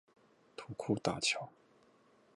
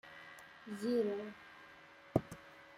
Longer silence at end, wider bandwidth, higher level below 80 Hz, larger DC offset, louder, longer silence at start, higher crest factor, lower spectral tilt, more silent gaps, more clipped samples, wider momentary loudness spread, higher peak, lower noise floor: first, 0.85 s vs 0 s; second, 11 kHz vs 16 kHz; about the same, -70 dBFS vs -70 dBFS; neither; first, -36 LUFS vs -39 LUFS; first, 0.6 s vs 0.05 s; about the same, 24 dB vs 26 dB; second, -3.5 dB/octave vs -7 dB/octave; neither; neither; about the same, 19 LU vs 20 LU; about the same, -18 dBFS vs -16 dBFS; first, -68 dBFS vs -59 dBFS